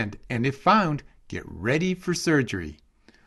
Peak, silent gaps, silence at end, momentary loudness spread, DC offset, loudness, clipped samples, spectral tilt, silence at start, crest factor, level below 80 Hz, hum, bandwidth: -6 dBFS; none; 0.55 s; 17 LU; under 0.1%; -24 LUFS; under 0.1%; -5.5 dB/octave; 0 s; 20 dB; -50 dBFS; none; 12.5 kHz